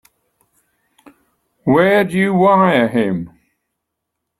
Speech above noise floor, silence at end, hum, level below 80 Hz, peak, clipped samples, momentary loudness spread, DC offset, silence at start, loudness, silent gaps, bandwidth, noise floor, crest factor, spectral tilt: 64 dB; 1.15 s; none; -56 dBFS; -2 dBFS; under 0.1%; 13 LU; under 0.1%; 1.65 s; -14 LUFS; none; 13.5 kHz; -77 dBFS; 16 dB; -7.5 dB/octave